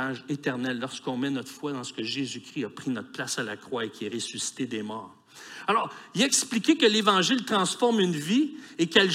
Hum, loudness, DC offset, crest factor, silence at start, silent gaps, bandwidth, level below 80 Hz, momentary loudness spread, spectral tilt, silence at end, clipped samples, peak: none; -27 LUFS; under 0.1%; 22 dB; 0 s; none; 16 kHz; -80 dBFS; 13 LU; -3 dB/octave; 0 s; under 0.1%; -6 dBFS